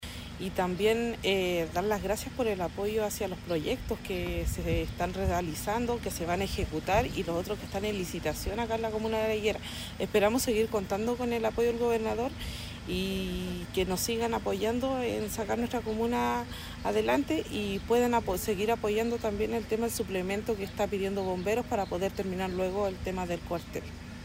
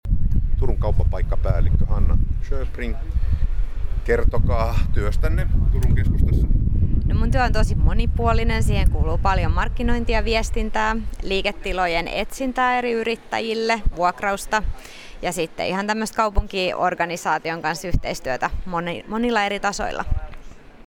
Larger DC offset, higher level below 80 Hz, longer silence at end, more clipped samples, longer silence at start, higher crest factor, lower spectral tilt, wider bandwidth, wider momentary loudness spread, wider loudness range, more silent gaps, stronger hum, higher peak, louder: neither; second, -44 dBFS vs -22 dBFS; about the same, 0 s vs 0.1 s; neither; about the same, 0 s vs 0.05 s; about the same, 18 dB vs 14 dB; about the same, -5 dB/octave vs -6 dB/octave; first, 16 kHz vs 13.5 kHz; about the same, 7 LU vs 7 LU; about the same, 3 LU vs 3 LU; neither; neither; second, -12 dBFS vs -4 dBFS; second, -31 LUFS vs -23 LUFS